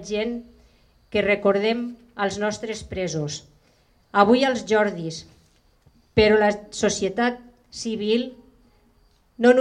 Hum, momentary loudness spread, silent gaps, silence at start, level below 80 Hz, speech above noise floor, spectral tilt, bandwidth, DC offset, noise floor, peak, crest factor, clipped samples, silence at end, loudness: none; 16 LU; none; 0 s; -52 dBFS; 38 dB; -4.5 dB/octave; 10.5 kHz; under 0.1%; -60 dBFS; 0 dBFS; 22 dB; under 0.1%; 0 s; -23 LUFS